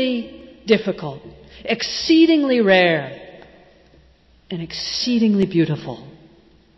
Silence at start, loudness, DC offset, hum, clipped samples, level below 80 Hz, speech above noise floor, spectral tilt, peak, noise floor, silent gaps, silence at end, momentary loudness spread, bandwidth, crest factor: 0 s; -18 LUFS; under 0.1%; none; under 0.1%; -54 dBFS; 35 dB; -5.5 dB/octave; -4 dBFS; -53 dBFS; none; 0.65 s; 20 LU; 6.2 kHz; 16 dB